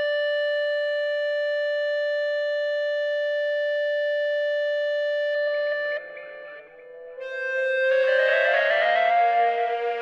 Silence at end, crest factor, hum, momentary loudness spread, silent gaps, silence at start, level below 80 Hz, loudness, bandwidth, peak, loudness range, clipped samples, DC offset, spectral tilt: 0 s; 14 dB; none; 13 LU; none; 0 s; -80 dBFS; -23 LUFS; 6.8 kHz; -10 dBFS; 5 LU; under 0.1%; under 0.1%; -0.5 dB/octave